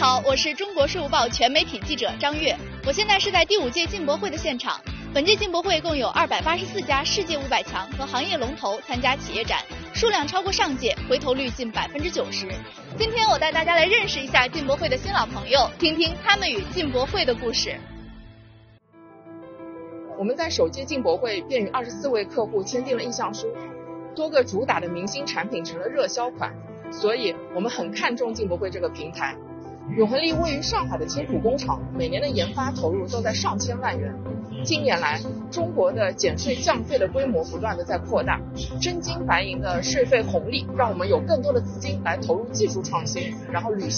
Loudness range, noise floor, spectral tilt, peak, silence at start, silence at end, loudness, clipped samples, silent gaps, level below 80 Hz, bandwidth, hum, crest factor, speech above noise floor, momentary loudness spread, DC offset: 5 LU; -51 dBFS; -2.5 dB/octave; -2 dBFS; 0 s; 0 s; -24 LUFS; under 0.1%; none; -44 dBFS; 7 kHz; none; 22 dB; 27 dB; 10 LU; under 0.1%